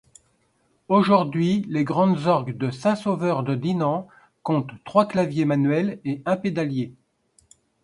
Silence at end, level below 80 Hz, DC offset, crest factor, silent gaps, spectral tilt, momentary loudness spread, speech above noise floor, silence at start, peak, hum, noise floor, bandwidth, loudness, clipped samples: 0.9 s; -64 dBFS; under 0.1%; 20 dB; none; -8 dB/octave; 8 LU; 44 dB; 0.9 s; -4 dBFS; none; -66 dBFS; 11 kHz; -23 LUFS; under 0.1%